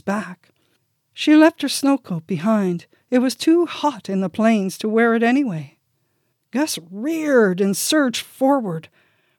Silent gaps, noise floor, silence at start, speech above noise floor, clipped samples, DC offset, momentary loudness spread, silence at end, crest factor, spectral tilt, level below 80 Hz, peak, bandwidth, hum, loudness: none; -69 dBFS; 0.05 s; 50 dB; under 0.1%; under 0.1%; 10 LU; 0.5 s; 18 dB; -5 dB/octave; -78 dBFS; -2 dBFS; 18 kHz; none; -19 LUFS